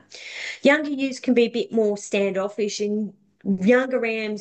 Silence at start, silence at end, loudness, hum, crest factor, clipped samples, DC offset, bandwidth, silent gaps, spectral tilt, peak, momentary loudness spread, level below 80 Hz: 0.1 s; 0 s; -22 LUFS; none; 18 dB; under 0.1%; under 0.1%; 9 kHz; none; -5 dB/octave; -4 dBFS; 13 LU; -68 dBFS